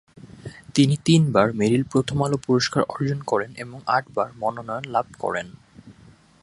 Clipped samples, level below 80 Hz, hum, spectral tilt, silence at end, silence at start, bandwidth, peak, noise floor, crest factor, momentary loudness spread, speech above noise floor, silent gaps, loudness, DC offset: under 0.1%; -54 dBFS; none; -6 dB/octave; 0.5 s; 0.25 s; 11.5 kHz; -2 dBFS; -51 dBFS; 20 dB; 14 LU; 30 dB; none; -22 LUFS; under 0.1%